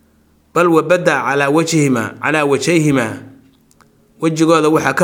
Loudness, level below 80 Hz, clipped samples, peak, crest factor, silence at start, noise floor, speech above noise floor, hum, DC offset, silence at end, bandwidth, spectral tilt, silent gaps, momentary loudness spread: -14 LUFS; -56 dBFS; under 0.1%; 0 dBFS; 14 dB; 0.55 s; -53 dBFS; 40 dB; none; under 0.1%; 0 s; 17 kHz; -5 dB/octave; none; 8 LU